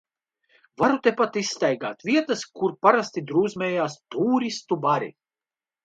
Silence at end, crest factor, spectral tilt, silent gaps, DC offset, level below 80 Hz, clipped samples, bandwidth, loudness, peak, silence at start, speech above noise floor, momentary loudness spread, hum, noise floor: 0.75 s; 22 dB; -5 dB/octave; none; under 0.1%; -68 dBFS; under 0.1%; 9 kHz; -24 LUFS; -2 dBFS; 0.8 s; over 67 dB; 8 LU; none; under -90 dBFS